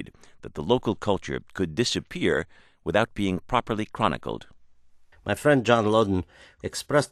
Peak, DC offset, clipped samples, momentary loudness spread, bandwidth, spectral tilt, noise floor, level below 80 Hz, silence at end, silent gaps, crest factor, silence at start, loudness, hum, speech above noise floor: -4 dBFS; under 0.1%; under 0.1%; 17 LU; 13 kHz; -5 dB/octave; -53 dBFS; -50 dBFS; 0.05 s; none; 22 dB; 0 s; -25 LUFS; none; 27 dB